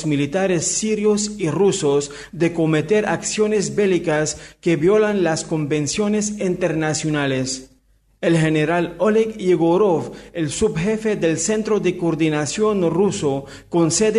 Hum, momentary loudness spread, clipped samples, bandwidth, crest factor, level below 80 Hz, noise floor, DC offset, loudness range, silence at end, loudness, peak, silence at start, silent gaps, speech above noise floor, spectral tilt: none; 6 LU; under 0.1%; 11.5 kHz; 12 dB; -50 dBFS; -58 dBFS; under 0.1%; 2 LU; 0 s; -19 LUFS; -6 dBFS; 0 s; none; 39 dB; -5 dB/octave